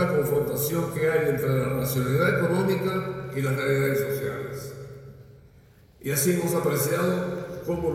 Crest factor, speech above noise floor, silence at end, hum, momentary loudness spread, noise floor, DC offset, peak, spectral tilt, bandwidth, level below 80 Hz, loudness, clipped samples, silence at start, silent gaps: 16 dB; 29 dB; 0 s; none; 11 LU; -54 dBFS; under 0.1%; -10 dBFS; -5.5 dB/octave; 17 kHz; -52 dBFS; -25 LUFS; under 0.1%; 0 s; none